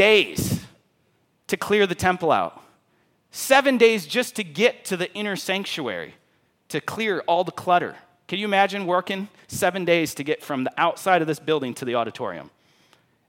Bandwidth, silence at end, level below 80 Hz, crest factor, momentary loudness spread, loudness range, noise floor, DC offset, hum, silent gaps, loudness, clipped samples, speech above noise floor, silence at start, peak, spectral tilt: 17 kHz; 0.8 s; -58 dBFS; 20 dB; 13 LU; 4 LU; -66 dBFS; under 0.1%; none; none; -23 LUFS; under 0.1%; 44 dB; 0 s; -4 dBFS; -4 dB/octave